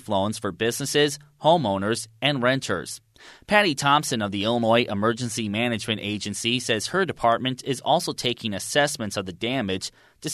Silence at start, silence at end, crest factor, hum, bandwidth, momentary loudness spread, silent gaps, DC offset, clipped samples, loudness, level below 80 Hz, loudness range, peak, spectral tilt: 0.05 s; 0 s; 20 dB; none; 13.5 kHz; 8 LU; none; under 0.1%; under 0.1%; -24 LUFS; -60 dBFS; 2 LU; -4 dBFS; -4 dB/octave